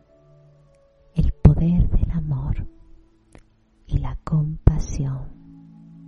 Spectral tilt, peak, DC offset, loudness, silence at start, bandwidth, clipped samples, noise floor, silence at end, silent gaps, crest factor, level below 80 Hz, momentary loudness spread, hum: -9 dB/octave; -2 dBFS; under 0.1%; -22 LUFS; 1.15 s; 7.4 kHz; under 0.1%; -55 dBFS; 0 s; none; 22 dB; -26 dBFS; 13 LU; none